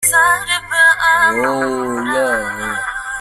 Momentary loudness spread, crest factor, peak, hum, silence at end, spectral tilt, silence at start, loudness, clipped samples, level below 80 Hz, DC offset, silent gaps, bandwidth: 10 LU; 14 dB; 0 dBFS; none; 0 s; -1.5 dB/octave; 0 s; -14 LUFS; under 0.1%; -46 dBFS; under 0.1%; none; 16 kHz